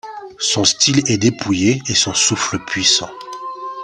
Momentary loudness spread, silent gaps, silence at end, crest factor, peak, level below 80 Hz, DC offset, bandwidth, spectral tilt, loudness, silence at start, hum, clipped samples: 16 LU; none; 0 s; 18 dB; 0 dBFS; -52 dBFS; under 0.1%; 11 kHz; -2.5 dB/octave; -15 LUFS; 0.05 s; none; under 0.1%